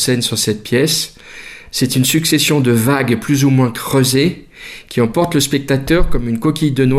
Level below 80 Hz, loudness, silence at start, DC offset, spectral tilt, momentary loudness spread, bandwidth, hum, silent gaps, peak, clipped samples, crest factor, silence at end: -30 dBFS; -14 LUFS; 0 s; under 0.1%; -4.5 dB/octave; 12 LU; 15.5 kHz; none; none; -2 dBFS; under 0.1%; 12 dB; 0 s